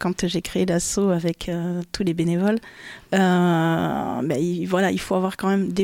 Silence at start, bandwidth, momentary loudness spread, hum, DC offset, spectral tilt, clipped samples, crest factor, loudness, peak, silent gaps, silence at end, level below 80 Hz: 0 s; 16 kHz; 7 LU; none; under 0.1%; -5.5 dB/octave; under 0.1%; 14 dB; -22 LUFS; -8 dBFS; none; 0 s; -48 dBFS